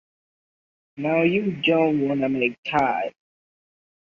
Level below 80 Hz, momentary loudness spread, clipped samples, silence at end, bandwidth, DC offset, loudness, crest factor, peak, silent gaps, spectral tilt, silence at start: -62 dBFS; 7 LU; under 0.1%; 1.05 s; 7.2 kHz; under 0.1%; -22 LUFS; 18 dB; -6 dBFS; 2.58-2.63 s; -7.5 dB/octave; 0.95 s